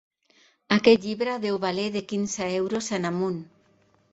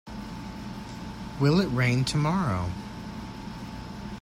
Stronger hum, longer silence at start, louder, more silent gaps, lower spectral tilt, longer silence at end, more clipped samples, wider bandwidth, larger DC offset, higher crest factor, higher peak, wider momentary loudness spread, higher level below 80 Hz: neither; first, 0.7 s vs 0.05 s; first, -25 LUFS vs -29 LUFS; neither; second, -4.5 dB/octave vs -6 dB/octave; first, 0.7 s vs 0 s; neither; second, 8.2 kHz vs 15 kHz; neither; about the same, 22 dB vs 18 dB; first, -4 dBFS vs -10 dBFS; second, 9 LU vs 15 LU; second, -64 dBFS vs -46 dBFS